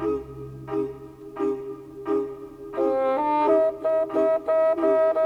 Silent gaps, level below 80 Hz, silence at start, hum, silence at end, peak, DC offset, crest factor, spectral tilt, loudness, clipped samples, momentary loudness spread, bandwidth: none; -56 dBFS; 0 s; none; 0 s; -10 dBFS; under 0.1%; 14 dB; -8 dB/octave; -24 LUFS; under 0.1%; 17 LU; 6.6 kHz